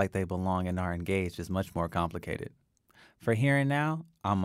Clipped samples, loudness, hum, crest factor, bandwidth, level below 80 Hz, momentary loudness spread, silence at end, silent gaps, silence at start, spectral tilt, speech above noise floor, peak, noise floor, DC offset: under 0.1%; -31 LUFS; none; 18 dB; 15.5 kHz; -54 dBFS; 11 LU; 0 s; none; 0 s; -7 dB/octave; 31 dB; -14 dBFS; -62 dBFS; under 0.1%